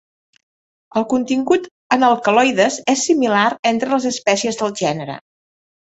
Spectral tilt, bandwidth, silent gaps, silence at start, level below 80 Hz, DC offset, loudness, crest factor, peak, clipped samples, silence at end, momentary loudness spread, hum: -3.5 dB/octave; 8.2 kHz; 1.71-1.90 s, 3.59-3.63 s; 0.95 s; -62 dBFS; under 0.1%; -17 LUFS; 16 dB; -2 dBFS; under 0.1%; 0.75 s; 8 LU; none